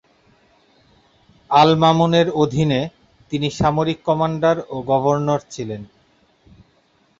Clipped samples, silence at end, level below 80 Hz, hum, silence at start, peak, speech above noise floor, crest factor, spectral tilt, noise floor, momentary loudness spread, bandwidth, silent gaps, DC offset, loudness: under 0.1%; 1.35 s; -50 dBFS; none; 1.5 s; -2 dBFS; 42 dB; 18 dB; -6.5 dB/octave; -59 dBFS; 15 LU; 7.8 kHz; none; under 0.1%; -18 LUFS